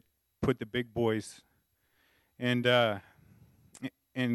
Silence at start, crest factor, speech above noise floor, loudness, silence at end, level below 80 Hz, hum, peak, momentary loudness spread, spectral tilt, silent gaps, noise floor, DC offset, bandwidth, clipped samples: 0.4 s; 22 dB; 44 dB; -31 LUFS; 0 s; -62 dBFS; none; -12 dBFS; 18 LU; -6 dB/octave; none; -74 dBFS; under 0.1%; 12 kHz; under 0.1%